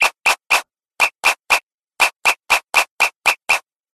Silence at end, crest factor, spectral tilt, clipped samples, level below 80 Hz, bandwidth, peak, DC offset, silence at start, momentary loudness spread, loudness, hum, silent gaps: 0.35 s; 18 dB; 1.5 dB/octave; under 0.1%; -54 dBFS; 13.5 kHz; 0 dBFS; under 0.1%; 0 s; 3 LU; -16 LUFS; none; 1.63-1.67 s, 1.74-1.78 s, 2.16-2.20 s, 2.91-2.97 s, 3.16-3.20 s